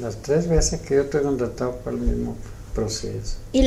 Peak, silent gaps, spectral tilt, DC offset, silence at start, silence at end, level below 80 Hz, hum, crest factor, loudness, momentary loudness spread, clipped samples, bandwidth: -6 dBFS; none; -5 dB/octave; under 0.1%; 0 s; 0 s; -30 dBFS; none; 18 dB; -24 LUFS; 11 LU; under 0.1%; 15 kHz